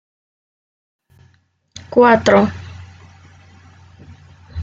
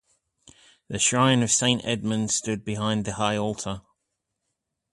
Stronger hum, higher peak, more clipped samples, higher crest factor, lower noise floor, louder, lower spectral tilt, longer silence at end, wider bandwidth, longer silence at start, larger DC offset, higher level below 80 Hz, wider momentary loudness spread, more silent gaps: neither; first, 0 dBFS vs -6 dBFS; neither; about the same, 20 dB vs 20 dB; second, -57 dBFS vs -81 dBFS; first, -13 LUFS vs -24 LUFS; first, -6 dB/octave vs -3.5 dB/octave; second, 0 s vs 1.1 s; second, 7.8 kHz vs 11.5 kHz; first, 1.9 s vs 0.9 s; neither; first, -50 dBFS vs -56 dBFS; first, 25 LU vs 12 LU; neither